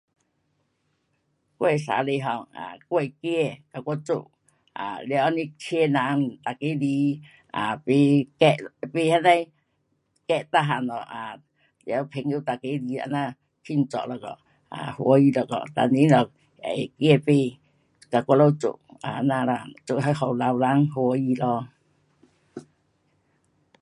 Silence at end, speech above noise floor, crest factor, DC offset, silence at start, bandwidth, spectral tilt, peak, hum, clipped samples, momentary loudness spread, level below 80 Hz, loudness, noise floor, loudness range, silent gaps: 1.2 s; 49 dB; 22 dB; under 0.1%; 1.6 s; 11.5 kHz; -7 dB/octave; -2 dBFS; none; under 0.1%; 17 LU; -70 dBFS; -24 LUFS; -72 dBFS; 7 LU; none